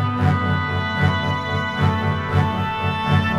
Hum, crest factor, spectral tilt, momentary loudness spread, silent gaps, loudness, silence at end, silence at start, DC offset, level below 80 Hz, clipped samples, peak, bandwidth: none; 14 dB; -7 dB/octave; 3 LU; none; -20 LUFS; 0 s; 0 s; under 0.1%; -42 dBFS; under 0.1%; -4 dBFS; 7.8 kHz